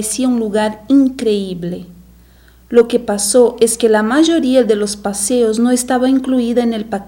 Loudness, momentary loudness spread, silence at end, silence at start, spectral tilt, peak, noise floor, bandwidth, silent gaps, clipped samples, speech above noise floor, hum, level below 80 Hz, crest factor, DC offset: -14 LUFS; 7 LU; 0 s; 0 s; -4 dB/octave; 0 dBFS; -45 dBFS; 16.5 kHz; none; under 0.1%; 31 dB; none; -46 dBFS; 14 dB; under 0.1%